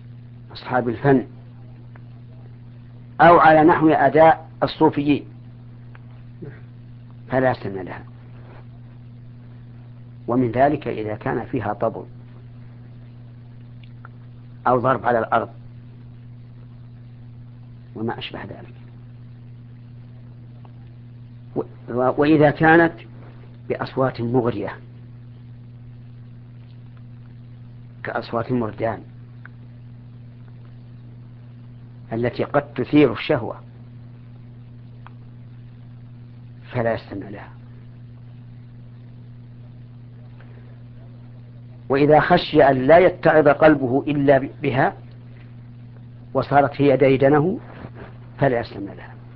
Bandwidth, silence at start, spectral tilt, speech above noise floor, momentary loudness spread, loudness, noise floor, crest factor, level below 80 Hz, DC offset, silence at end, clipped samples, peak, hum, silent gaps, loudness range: 5.6 kHz; 0 s; -10.5 dB/octave; 22 dB; 27 LU; -19 LUFS; -40 dBFS; 22 dB; -50 dBFS; under 0.1%; 0 s; under 0.1%; 0 dBFS; none; none; 20 LU